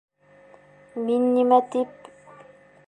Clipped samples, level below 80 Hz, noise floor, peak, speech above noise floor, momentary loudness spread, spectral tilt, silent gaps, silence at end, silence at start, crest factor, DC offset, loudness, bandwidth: under 0.1%; -76 dBFS; -53 dBFS; -6 dBFS; 32 dB; 14 LU; -6.5 dB/octave; none; 1 s; 0.95 s; 20 dB; under 0.1%; -22 LUFS; 10.5 kHz